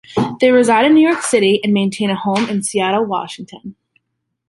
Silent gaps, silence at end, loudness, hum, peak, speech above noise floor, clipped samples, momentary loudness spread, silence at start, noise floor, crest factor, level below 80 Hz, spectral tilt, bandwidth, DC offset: none; 0.75 s; -14 LUFS; none; -2 dBFS; 59 dB; under 0.1%; 15 LU; 0.1 s; -73 dBFS; 14 dB; -58 dBFS; -4.5 dB/octave; 11.5 kHz; under 0.1%